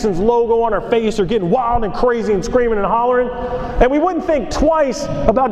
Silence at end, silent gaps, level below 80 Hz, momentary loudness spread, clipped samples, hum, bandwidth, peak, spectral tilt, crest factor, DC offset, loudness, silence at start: 0 s; none; -28 dBFS; 4 LU; under 0.1%; none; 10 kHz; 0 dBFS; -6 dB/octave; 16 dB; under 0.1%; -16 LUFS; 0 s